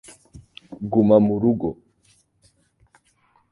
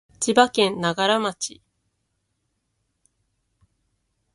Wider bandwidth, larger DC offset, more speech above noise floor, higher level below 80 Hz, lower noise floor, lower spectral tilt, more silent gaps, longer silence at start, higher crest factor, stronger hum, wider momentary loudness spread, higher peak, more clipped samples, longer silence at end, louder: about the same, 11.5 kHz vs 11.5 kHz; neither; second, 45 dB vs 54 dB; first, -54 dBFS vs -66 dBFS; second, -63 dBFS vs -74 dBFS; first, -9 dB/octave vs -3 dB/octave; neither; first, 0.35 s vs 0.2 s; about the same, 22 dB vs 26 dB; neither; first, 17 LU vs 12 LU; about the same, -2 dBFS vs 0 dBFS; neither; second, 1.8 s vs 2.85 s; about the same, -19 LUFS vs -21 LUFS